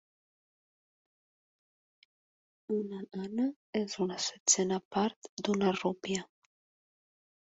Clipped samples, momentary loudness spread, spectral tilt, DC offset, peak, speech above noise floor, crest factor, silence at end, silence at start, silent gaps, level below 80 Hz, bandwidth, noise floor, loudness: under 0.1%; 11 LU; -3.5 dB/octave; under 0.1%; -10 dBFS; over 57 dB; 26 dB; 1.35 s; 2.7 s; 3.56-3.73 s, 4.40-4.46 s, 4.85-4.91 s, 5.16-5.22 s, 5.29-5.37 s; -74 dBFS; 8.2 kHz; under -90 dBFS; -33 LUFS